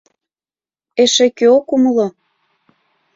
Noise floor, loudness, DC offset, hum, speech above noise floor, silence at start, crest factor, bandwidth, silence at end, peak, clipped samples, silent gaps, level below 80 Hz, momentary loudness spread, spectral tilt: under -90 dBFS; -13 LUFS; under 0.1%; none; over 78 dB; 0.95 s; 16 dB; 7.8 kHz; 1.05 s; 0 dBFS; under 0.1%; none; -62 dBFS; 9 LU; -3 dB/octave